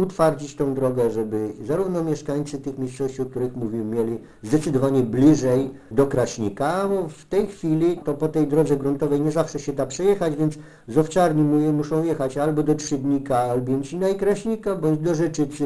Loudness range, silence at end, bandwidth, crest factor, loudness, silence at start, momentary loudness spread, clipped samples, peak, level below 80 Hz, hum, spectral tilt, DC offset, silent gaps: 4 LU; 0 s; 11 kHz; 16 dB; -22 LUFS; 0 s; 8 LU; under 0.1%; -4 dBFS; -48 dBFS; none; -7 dB/octave; under 0.1%; none